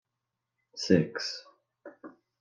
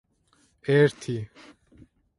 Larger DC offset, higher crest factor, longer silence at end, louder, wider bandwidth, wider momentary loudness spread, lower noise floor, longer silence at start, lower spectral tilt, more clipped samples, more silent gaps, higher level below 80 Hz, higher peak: neither; about the same, 24 dB vs 20 dB; second, 0.3 s vs 0.95 s; second, -29 LUFS vs -25 LUFS; second, 9.4 kHz vs 11.5 kHz; first, 23 LU vs 17 LU; first, -86 dBFS vs -65 dBFS; about the same, 0.75 s vs 0.65 s; second, -5.5 dB/octave vs -7 dB/octave; neither; neither; second, -72 dBFS vs -62 dBFS; second, -10 dBFS vs -6 dBFS